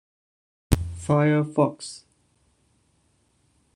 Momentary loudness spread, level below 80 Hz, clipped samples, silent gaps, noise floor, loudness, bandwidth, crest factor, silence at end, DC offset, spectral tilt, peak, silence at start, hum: 18 LU; -40 dBFS; under 0.1%; none; -66 dBFS; -23 LUFS; 13 kHz; 24 dB; 1.8 s; under 0.1%; -7 dB/octave; -2 dBFS; 0.7 s; none